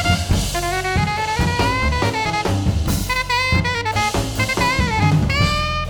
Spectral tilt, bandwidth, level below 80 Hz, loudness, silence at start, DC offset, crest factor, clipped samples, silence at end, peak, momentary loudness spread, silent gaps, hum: -4.5 dB/octave; over 20 kHz; -28 dBFS; -18 LUFS; 0 s; under 0.1%; 14 dB; under 0.1%; 0 s; -4 dBFS; 3 LU; none; none